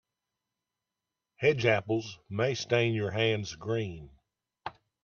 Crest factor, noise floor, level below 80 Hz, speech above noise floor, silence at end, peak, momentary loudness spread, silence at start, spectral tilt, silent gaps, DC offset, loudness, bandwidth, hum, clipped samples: 22 dB; -88 dBFS; -64 dBFS; 59 dB; 0.35 s; -10 dBFS; 18 LU; 1.4 s; -5.5 dB/octave; none; under 0.1%; -30 LUFS; 7.2 kHz; none; under 0.1%